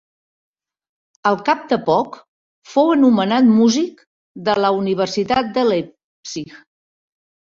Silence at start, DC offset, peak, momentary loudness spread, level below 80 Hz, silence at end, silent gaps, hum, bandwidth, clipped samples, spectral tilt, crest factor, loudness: 1.25 s; under 0.1%; -2 dBFS; 16 LU; -58 dBFS; 1 s; 2.28-2.62 s, 4.07-4.35 s, 6.04-6.23 s; none; 7.6 kHz; under 0.1%; -5.5 dB/octave; 18 dB; -17 LUFS